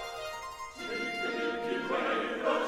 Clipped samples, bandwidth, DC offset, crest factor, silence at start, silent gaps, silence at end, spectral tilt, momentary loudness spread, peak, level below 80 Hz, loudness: under 0.1%; 17 kHz; under 0.1%; 18 dB; 0 s; none; 0 s; -3.5 dB/octave; 10 LU; -16 dBFS; -64 dBFS; -34 LUFS